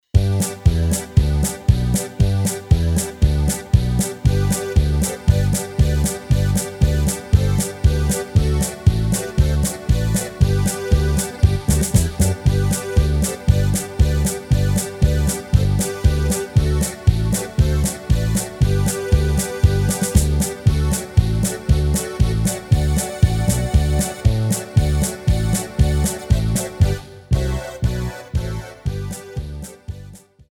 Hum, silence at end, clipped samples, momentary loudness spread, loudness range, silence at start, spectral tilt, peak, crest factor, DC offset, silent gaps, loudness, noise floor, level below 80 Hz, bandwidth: none; 0.35 s; under 0.1%; 4 LU; 2 LU; 0.15 s; -5.5 dB/octave; 0 dBFS; 18 dB; under 0.1%; none; -19 LUFS; -40 dBFS; -22 dBFS; 18.5 kHz